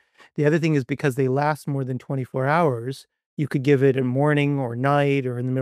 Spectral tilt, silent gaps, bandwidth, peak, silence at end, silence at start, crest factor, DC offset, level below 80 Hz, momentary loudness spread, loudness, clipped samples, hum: -7.5 dB/octave; 3.26-3.37 s; 13.5 kHz; -6 dBFS; 0 s; 0.35 s; 16 dB; under 0.1%; -68 dBFS; 11 LU; -22 LUFS; under 0.1%; none